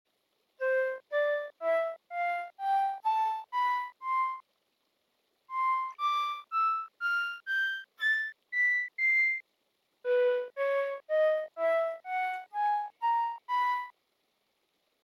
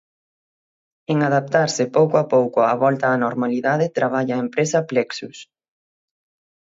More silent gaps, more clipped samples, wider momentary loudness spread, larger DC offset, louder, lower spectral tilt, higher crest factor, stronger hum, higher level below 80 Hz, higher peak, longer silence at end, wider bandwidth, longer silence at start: neither; neither; about the same, 7 LU vs 6 LU; neither; second, -30 LUFS vs -19 LUFS; second, 0.5 dB/octave vs -5.5 dB/octave; second, 12 dB vs 18 dB; neither; second, under -90 dBFS vs -70 dBFS; second, -20 dBFS vs -4 dBFS; second, 1.15 s vs 1.3 s; first, 15.5 kHz vs 7.8 kHz; second, 0.6 s vs 1.1 s